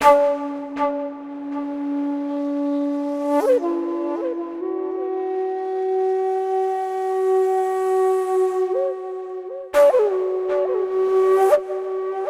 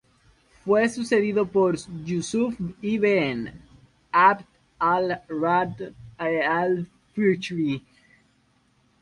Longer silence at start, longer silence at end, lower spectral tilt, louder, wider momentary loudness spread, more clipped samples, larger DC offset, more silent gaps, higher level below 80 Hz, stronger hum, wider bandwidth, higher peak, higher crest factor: second, 0 s vs 0.65 s; second, 0 s vs 1.25 s; second, -4.5 dB/octave vs -6 dB/octave; first, -21 LUFS vs -24 LUFS; about the same, 11 LU vs 11 LU; neither; neither; neither; about the same, -62 dBFS vs -60 dBFS; neither; first, 15 kHz vs 11 kHz; first, -2 dBFS vs -6 dBFS; about the same, 18 dB vs 18 dB